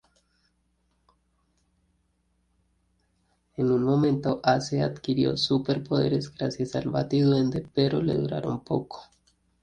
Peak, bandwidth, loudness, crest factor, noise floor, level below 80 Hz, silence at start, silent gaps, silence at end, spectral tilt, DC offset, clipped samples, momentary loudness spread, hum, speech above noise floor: -8 dBFS; 9.4 kHz; -26 LUFS; 20 dB; -71 dBFS; -58 dBFS; 3.6 s; none; 0.6 s; -7 dB/octave; under 0.1%; under 0.1%; 8 LU; none; 46 dB